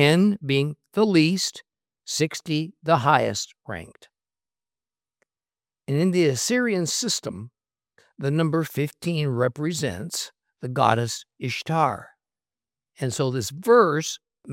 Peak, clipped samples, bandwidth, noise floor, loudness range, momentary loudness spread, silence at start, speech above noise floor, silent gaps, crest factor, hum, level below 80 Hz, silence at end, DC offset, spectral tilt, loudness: -2 dBFS; under 0.1%; 16.5 kHz; under -90 dBFS; 4 LU; 14 LU; 0 s; over 67 dB; none; 22 dB; none; -68 dBFS; 0 s; under 0.1%; -5 dB/octave; -23 LUFS